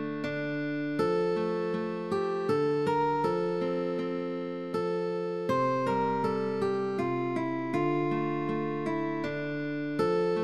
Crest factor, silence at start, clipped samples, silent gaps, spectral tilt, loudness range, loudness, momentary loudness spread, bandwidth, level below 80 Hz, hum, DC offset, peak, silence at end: 14 dB; 0 s; under 0.1%; none; -7.5 dB/octave; 1 LU; -30 LUFS; 6 LU; 12 kHz; -68 dBFS; none; 0.1%; -16 dBFS; 0 s